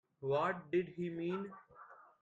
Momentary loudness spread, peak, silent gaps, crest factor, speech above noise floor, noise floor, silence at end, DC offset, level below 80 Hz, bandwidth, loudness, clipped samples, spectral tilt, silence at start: 22 LU; -24 dBFS; none; 16 dB; 21 dB; -59 dBFS; 0.2 s; under 0.1%; -78 dBFS; 7.6 kHz; -38 LUFS; under 0.1%; -8 dB/octave; 0.2 s